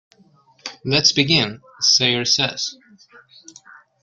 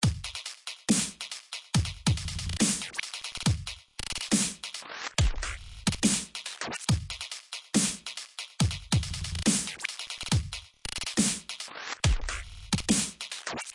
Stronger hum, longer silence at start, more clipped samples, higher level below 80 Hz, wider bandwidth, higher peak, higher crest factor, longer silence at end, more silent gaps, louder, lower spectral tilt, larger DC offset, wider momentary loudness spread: neither; first, 0.65 s vs 0 s; neither; second, -58 dBFS vs -40 dBFS; about the same, 12 kHz vs 11.5 kHz; first, -2 dBFS vs -12 dBFS; about the same, 20 dB vs 20 dB; first, 1.3 s vs 0 s; neither; first, -17 LUFS vs -30 LUFS; about the same, -2.5 dB/octave vs -3.5 dB/octave; neither; first, 16 LU vs 11 LU